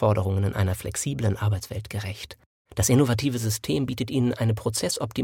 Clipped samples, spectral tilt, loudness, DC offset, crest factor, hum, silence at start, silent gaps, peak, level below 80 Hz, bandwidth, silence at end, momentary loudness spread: under 0.1%; -5.5 dB/octave; -25 LUFS; under 0.1%; 16 dB; none; 0 s; 2.46-2.65 s; -8 dBFS; -48 dBFS; 17 kHz; 0 s; 12 LU